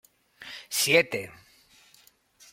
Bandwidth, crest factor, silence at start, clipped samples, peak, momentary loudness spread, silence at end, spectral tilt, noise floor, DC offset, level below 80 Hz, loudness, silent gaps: 16.5 kHz; 24 dB; 0.4 s; under 0.1%; -8 dBFS; 22 LU; 1.2 s; -2 dB/octave; -61 dBFS; under 0.1%; -70 dBFS; -24 LUFS; none